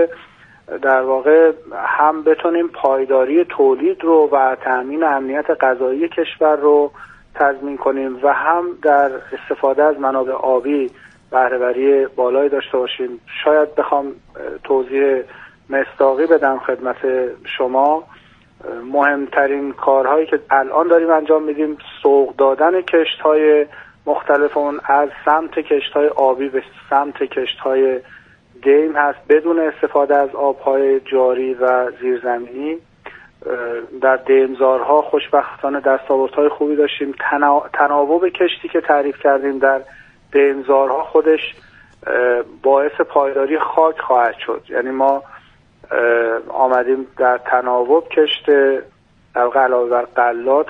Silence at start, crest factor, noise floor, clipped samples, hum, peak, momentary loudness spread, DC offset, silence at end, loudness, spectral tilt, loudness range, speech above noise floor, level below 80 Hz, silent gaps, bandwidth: 0 s; 16 dB; -47 dBFS; under 0.1%; none; 0 dBFS; 8 LU; under 0.1%; 0 s; -16 LUFS; -6 dB/octave; 3 LU; 32 dB; -58 dBFS; none; 4.1 kHz